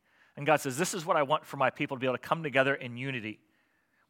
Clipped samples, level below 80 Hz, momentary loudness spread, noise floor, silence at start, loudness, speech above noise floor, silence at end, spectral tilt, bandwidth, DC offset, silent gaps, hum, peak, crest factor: under 0.1%; -82 dBFS; 8 LU; -72 dBFS; 0.35 s; -30 LUFS; 42 dB; 0.75 s; -4.5 dB/octave; 17 kHz; under 0.1%; none; none; -8 dBFS; 22 dB